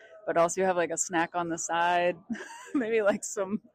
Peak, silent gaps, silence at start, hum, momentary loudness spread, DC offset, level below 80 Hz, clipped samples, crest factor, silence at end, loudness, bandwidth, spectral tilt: -14 dBFS; none; 0.1 s; none; 8 LU; under 0.1%; -72 dBFS; under 0.1%; 14 dB; 0.15 s; -28 LUFS; 15.5 kHz; -3.5 dB/octave